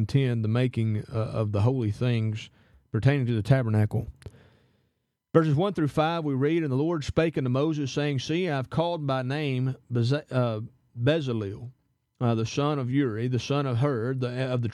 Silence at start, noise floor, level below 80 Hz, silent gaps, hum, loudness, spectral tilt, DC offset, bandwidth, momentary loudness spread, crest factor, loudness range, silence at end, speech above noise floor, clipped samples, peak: 0 s; -76 dBFS; -54 dBFS; none; none; -27 LUFS; -7.5 dB/octave; under 0.1%; 11 kHz; 7 LU; 22 dB; 2 LU; 0 s; 50 dB; under 0.1%; -6 dBFS